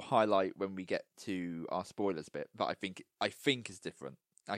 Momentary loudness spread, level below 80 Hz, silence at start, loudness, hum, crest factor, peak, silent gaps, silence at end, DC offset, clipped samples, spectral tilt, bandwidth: 14 LU; -78 dBFS; 0 s; -37 LUFS; none; 22 dB; -14 dBFS; none; 0 s; under 0.1%; under 0.1%; -5 dB/octave; 16 kHz